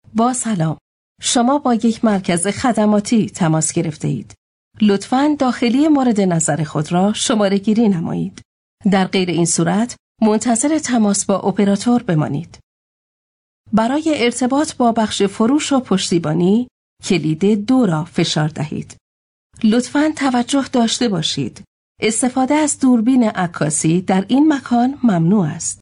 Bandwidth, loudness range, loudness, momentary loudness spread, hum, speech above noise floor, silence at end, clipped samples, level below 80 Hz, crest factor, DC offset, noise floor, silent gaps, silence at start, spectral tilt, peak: 11 kHz; 3 LU; -16 LUFS; 7 LU; none; over 74 dB; 0.05 s; under 0.1%; -54 dBFS; 10 dB; under 0.1%; under -90 dBFS; 0.81-1.15 s, 4.38-4.71 s, 8.45-8.78 s, 9.99-10.15 s, 12.63-13.64 s, 16.71-16.97 s, 19.01-19.50 s, 21.67-21.95 s; 0.15 s; -5 dB/octave; -6 dBFS